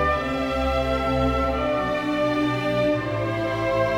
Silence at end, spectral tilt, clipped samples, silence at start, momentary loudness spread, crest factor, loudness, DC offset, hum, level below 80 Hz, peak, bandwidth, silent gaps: 0 s; -6.5 dB/octave; under 0.1%; 0 s; 3 LU; 12 dB; -23 LUFS; under 0.1%; none; -34 dBFS; -10 dBFS; 19 kHz; none